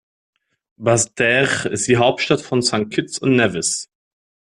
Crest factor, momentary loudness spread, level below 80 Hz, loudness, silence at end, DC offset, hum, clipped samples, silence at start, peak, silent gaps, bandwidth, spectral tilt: 16 dB; 7 LU; -54 dBFS; -18 LUFS; 0.75 s; under 0.1%; none; under 0.1%; 0.8 s; -2 dBFS; none; 12.5 kHz; -3.5 dB/octave